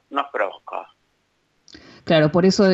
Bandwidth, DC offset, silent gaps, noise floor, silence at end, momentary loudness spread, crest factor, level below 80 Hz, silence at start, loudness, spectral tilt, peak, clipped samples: 8 kHz; under 0.1%; none; -67 dBFS; 0 s; 18 LU; 16 dB; -56 dBFS; 0.1 s; -19 LUFS; -6 dB/octave; -6 dBFS; under 0.1%